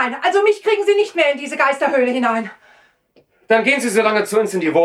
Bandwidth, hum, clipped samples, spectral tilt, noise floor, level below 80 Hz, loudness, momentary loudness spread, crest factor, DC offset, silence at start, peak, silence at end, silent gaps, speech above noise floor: 13.5 kHz; none; under 0.1%; -3.5 dB/octave; -57 dBFS; -74 dBFS; -16 LUFS; 3 LU; 14 dB; under 0.1%; 0 s; -2 dBFS; 0 s; none; 41 dB